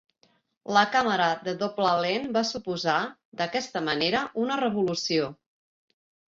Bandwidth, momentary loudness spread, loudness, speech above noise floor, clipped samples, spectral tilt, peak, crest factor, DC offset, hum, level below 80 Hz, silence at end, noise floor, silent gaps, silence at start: 7.8 kHz; 7 LU; -26 LUFS; 41 dB; under 0.1%; -4 dB/octave; -6 dBFS; 22 dB; under 0.1%; none; -68 dBFS; 0.95 s; -67 dBFS; 3.25-3.32 s; 0.65 s